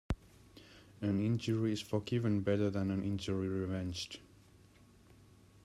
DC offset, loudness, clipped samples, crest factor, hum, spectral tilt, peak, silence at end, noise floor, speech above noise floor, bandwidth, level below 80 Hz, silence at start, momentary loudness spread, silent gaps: under 0.1%; -36 LUFS; under 0.1%; 18 dB; none; -7 dB/octave; -20 dBFS; 1.4 s; -62 dBFS; 27 dB; 13 kHz; -56 dBFS; 0.1 s; 10 LU; none